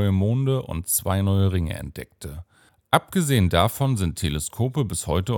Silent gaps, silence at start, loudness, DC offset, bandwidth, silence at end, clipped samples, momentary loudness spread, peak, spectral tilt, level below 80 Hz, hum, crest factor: none; 0 s; -23 LUFS; under 0.1%; 17 kHz; 0 s; under 0.1%; 16 LU; 0 dBFS; -5.5 dB/octave; -40 dBFS; none; 22 dB